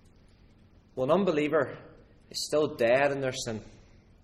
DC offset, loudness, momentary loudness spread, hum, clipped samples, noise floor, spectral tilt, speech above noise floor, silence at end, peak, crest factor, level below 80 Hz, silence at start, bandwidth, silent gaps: under 0.1%; -28 LUFS; 15 LU; none; under 0.1%; -58 dBFS; -4.5 dB/octave; 30 dB; 0.55 s; -12 dBFS; 18 dB; -60 dBFS; 0.95 s; 13.5 kHz; none